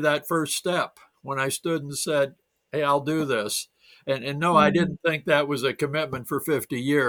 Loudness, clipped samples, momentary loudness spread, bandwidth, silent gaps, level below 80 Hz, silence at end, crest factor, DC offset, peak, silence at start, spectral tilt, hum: -25 LUFS; under 0.1%; 9 LU; over 20 kHz; none; -62 dBFS; 0 s; 20 dB; under 0.1%; -4 dBFS; 0 s; -4.5 dB/octave; none